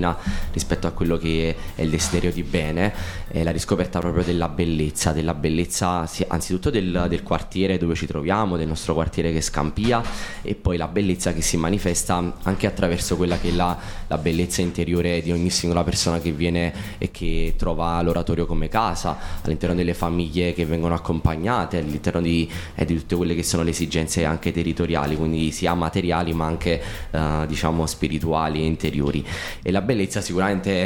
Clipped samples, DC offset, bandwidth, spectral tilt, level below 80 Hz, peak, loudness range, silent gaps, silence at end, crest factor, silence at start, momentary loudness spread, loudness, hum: under 0.1%; under 0.1%; 18.5 kHz; -5 dB/octave; -32 dBFS; -2 dBFS; 1 LU; none; 0 s; 20 dB; 0 s; 5 LU; -23 LUFS; none